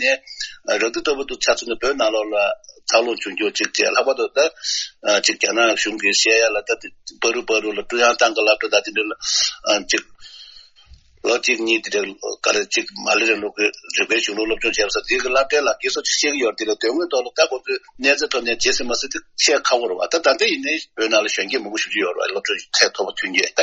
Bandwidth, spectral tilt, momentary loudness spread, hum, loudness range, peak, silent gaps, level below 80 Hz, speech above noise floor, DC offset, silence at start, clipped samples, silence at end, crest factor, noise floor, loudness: 8.4 kHz; 0 dB/octave; 7 LU; none; 3 LU; 0 dBFS; none; -52 dBFS; 29 dB; under 0.1%; 0 s; under 0.1%; 0 s; 20 dB; -48 dBFS; -19 LUFS